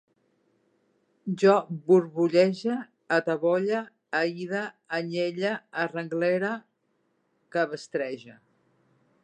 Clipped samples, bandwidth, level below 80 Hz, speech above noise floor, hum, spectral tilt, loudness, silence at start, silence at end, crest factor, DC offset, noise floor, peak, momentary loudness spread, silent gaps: under 0.1%; 9.2 kHz; -84 dBFS; 47 dB; none; -6.5 dB/octave; -27 LUFS; 1.25 s; 0.9 s; 20 dB; under 0.1%; -73 dBFS; -8 dBFS; 11 LU; none